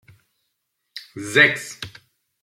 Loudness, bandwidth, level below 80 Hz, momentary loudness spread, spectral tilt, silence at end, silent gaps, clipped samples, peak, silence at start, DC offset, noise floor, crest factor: -17 LUFS; 16.5 kHz; -64 dBFS; 24 LU; -3 dB/octave; 0.55 s; none; under 0.1%; -2 dBFS; 0.95 s; under 0.1%; -75 dBFS; 22 dB